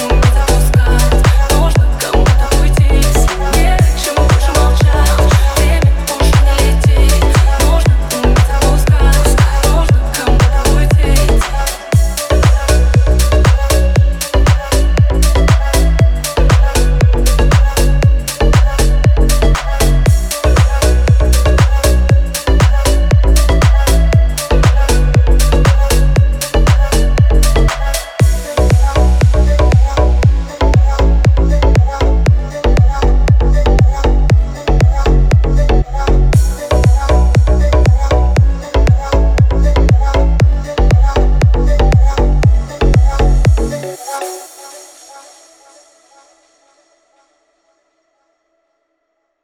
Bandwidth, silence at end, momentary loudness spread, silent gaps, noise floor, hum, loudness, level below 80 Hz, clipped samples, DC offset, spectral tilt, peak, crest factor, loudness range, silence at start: 16 kHz; 4.25 s; 3 LU; none; -67 dBFS; none; -12 LUFS; -12 dBFS; under 0.1%; under 0.1%; -5.5 dB/octave; 0 dBFS; 8 dB; 1 LU; 0 s